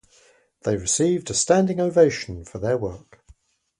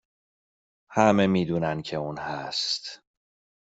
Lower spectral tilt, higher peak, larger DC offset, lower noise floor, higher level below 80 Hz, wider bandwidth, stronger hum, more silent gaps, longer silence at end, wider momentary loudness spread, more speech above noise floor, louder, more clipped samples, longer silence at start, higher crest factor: about the same, -4.5 dB/octave vs -5.5 dB/octave; about the same, -4 dBFS vs -4 dBFS; neither; second, -58 dBFS vs under -90 dBFS; first, -50 dBFS vs -62 dBFS; first, 11.5 kHz vs 8 kHz; neither; neither; first, 0.8 s vs 0.65 s; about the same, 13 LU vs 12 LU; second, 36 dB vs over 65 dB; first, -22 LUFS vs -26 LUFS; neither; second, 0.65 s vs 0.9 s; second, 18 dB vs 24 dB